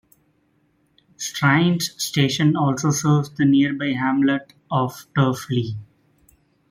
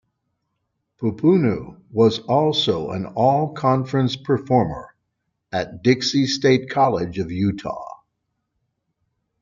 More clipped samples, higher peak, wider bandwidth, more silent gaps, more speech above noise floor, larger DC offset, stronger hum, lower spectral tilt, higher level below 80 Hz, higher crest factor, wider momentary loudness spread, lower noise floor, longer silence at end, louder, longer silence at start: neither; about the same, -4 dBFS vs -2 dBFS; first, 16 kHz vs 7.6 kHz; neither; second, 44 dB vs 56 dB; neither; neither; about the same, -5 dB/octave vs -6 dB/octave; about the same, -58 dBFS vs -54 dBFS; about the same, 18 dB vs 18 dB; about the same, 9 LU vs 11 LU; second, -64 dBFS vs -76 dBFS; second, 0.85 s vs 1.45 s; about the same, -20 LUFS vs -20 LUFS; first, 1.2 s vs 1 s